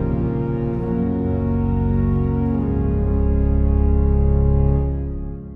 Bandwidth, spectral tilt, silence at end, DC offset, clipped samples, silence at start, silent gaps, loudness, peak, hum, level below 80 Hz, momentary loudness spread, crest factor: 2.9 kHz; -13 dB/octave; 0 s; under 0.1%; under 0.1%; 0 s; none; -20 LUFS; -6 dBFS; none; -22 dBFS; 5 LU; 12 dB